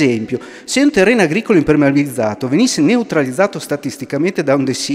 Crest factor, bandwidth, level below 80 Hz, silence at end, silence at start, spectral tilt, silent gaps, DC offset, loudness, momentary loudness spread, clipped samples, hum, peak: 14 dB; 15.5 kHz; -48 dBFS; 0 s; 0 s; -5 dB/octave; none; under 0.1%; -15 LUFS; 10 LU; under 0.1%; none; 0 dBFS